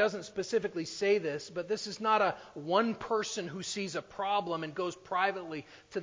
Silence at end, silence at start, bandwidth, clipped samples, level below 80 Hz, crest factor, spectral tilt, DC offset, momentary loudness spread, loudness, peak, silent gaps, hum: 0 s; 0 s; 7.6 kHz; under 0.1%; -72 dBFS; 20 dB; -4 dB/octave; under 0.1%; 9 LU; -33 LUFS; -14 dBFS; none; none